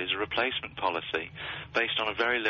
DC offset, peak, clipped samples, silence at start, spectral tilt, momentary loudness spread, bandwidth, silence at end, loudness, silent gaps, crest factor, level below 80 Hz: under 0.1%; -14 dBFS; under 0.1%; 0 s; 0 dB/octave; 7 LU; 6.8 kHz; 0 s; -30 LUFS; none; 16 dB; -60 dBFS